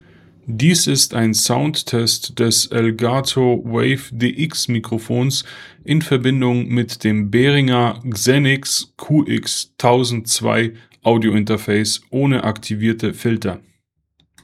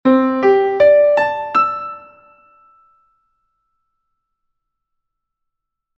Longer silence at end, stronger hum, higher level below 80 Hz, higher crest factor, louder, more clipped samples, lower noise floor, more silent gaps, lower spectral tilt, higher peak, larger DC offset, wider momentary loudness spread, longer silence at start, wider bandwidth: second, 0.85 s vs 4 s; neither; first, -56 dBFS vs -62 dBFS; about the same, 18 dB vs 16 dB; second, -17 LUFS vs -14 LUFS; neither; second, -64 dBFS vs -77 dBFS; neither; second, -4.5 dB/octave vs -6.5 dB/octave; about the same, 0 dBFS vs -2 dBFS; neither; second, 7 LU vs 16 LU; first, 0.45 s vs 0.05 s; first, 15.5 kHz vs 6.8 kHz